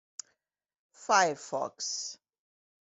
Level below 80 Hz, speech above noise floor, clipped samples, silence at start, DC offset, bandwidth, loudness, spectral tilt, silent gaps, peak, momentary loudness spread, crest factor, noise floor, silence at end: -82 dBFS; 46 dB; under 0.1%; 1 s; under 0.1%; 8.2 kHz; -30 LUFS; -1 dB/octave; none; -10 dBFS; 21 LU; 24 dB; -76 dBFS; 0.8 s